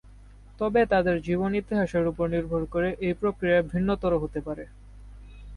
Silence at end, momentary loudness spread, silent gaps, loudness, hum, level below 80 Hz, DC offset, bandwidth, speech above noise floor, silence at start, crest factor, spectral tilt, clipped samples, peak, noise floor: 0 s; 9 LU; none; -26 LUFS; 50 Hz at -45 dBFS; -44 dBFS; under 0.1%; 11 kHz; 23 dB; 0.05 s; 16 dB; -8 dB/octave; under 0.1%; -12 dBFS; -49 dBFS